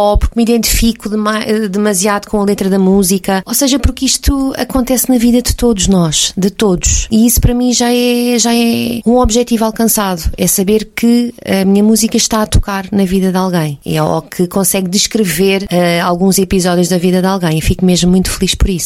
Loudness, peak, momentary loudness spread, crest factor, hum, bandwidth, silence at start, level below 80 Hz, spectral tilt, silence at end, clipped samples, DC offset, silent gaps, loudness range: -11 LUFS; 0 dBFS; 5 LU; 10 dB; none; 16.5 kHz; 0 s; -22 dBFS; -4.5 dB/octave; 0 s; under 0.1%; under 0.1%; none; 2 LU